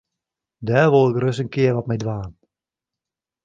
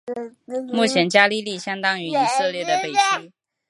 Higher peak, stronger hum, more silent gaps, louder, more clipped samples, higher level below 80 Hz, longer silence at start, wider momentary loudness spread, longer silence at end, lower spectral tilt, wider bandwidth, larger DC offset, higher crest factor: about the same, -2 dBFS vs 0 dBFS; neither; neither; about the same, -19 LUFS vs -20 LUFS; neither; first, -52 dBFS vs -76 dBFS; first, 0.6 s vs 0.05 s; about the same, 16 LU vs 14 LU; first, 1.15 s vs 0.4 s; first, -7.5 dB/octave vs -3 dB/octave; second, 7.8 kHz vs 11.5 kHz; neither; about the same, 18 dB vs 20 dB